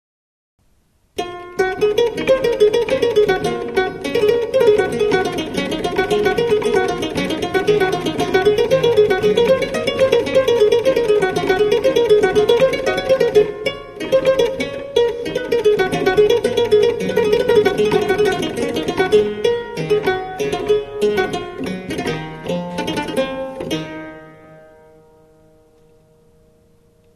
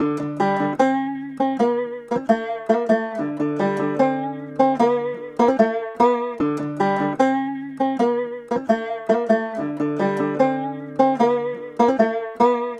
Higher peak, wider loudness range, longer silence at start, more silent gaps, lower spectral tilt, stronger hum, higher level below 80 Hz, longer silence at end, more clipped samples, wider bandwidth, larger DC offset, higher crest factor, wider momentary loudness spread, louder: about the same, 0 dBFS vs -2 dBFS; first, 9 LU vs 2 LU; first, 1.15 s vs 0 s; neither; second, -5 dB/octave vs -7 dB/octave; neither; first, -44 dBFS vs -64 dBFS; first, 2.6 s vs 0 s; neither; first, 13.5 kHz vs 10 kHz; neither; about the same, 16 dB vs 18 dB; about the same, 10 LU vs 8 LU; first, -17 LUFS vs -21 LUFS